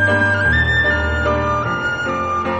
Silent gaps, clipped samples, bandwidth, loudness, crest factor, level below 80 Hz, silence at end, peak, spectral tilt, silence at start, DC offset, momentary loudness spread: none; under 0.1%; 8.6 kHz; -16 LUFS; 12 dB; -28 dBFS; 0 s; -4 dBFS; -6 dB/octave; 0 s; under 0.1%; 6 LU